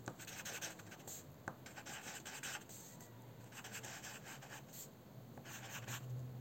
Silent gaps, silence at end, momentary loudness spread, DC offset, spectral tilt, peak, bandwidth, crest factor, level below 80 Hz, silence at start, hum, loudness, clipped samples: none; 0 s; 8 LU; under 0.1%; -3 dB/octave; -26 dBFS; 16.5 kHz; 24 dB; -78 dBFS; 0 s; none; -50 LUFS; under 0.1%